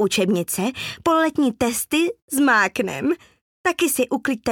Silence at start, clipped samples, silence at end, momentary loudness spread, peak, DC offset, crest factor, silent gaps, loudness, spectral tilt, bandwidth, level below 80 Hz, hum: 0 s; under 0.1%; 0 s; 7 LU; -6 dBFS; under 0.1%; 14 dB; 2.22-2.28 s, 3.41-3.64 s; -21 LUFS; -3.5 dB/octave; 19 kHz; -56 dBFS; none